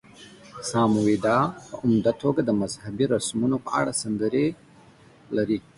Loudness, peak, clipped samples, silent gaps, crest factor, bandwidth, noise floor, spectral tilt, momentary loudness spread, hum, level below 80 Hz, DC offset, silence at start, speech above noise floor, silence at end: -24 LUFS; -8 dBFS; under 0.1%; none; 16 dB; 11.5 kHz; -52 dBFS; -5.5 dB/octave; 7 LU; none; -58 dBFS; under 0.1%; 0.2 s; 29 dB; 0.15 s